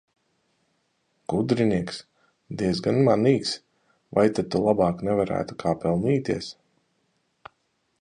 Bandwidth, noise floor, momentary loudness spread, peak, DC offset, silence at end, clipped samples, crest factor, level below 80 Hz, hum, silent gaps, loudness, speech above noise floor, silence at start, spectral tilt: 10.5 kHz; -72 dBFS; 14 LU; -6 dBFS; under 0.1%; 1.5 s; under 0.1%; 20 dB; -54 dBFS; none; none; -24 LUFS; 49 dB; 1.3 s; -7 dB/octave